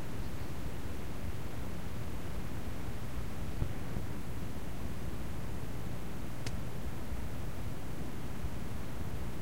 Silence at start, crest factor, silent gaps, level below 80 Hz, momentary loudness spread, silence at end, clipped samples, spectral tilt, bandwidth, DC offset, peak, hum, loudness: 0 s; 22 dB; none; -46 dBFS; 2 LU; 0 s; under 0.1%; -6 dB/octave; 16 kHz; 2%; -18 dBFS; none; -42 LUFS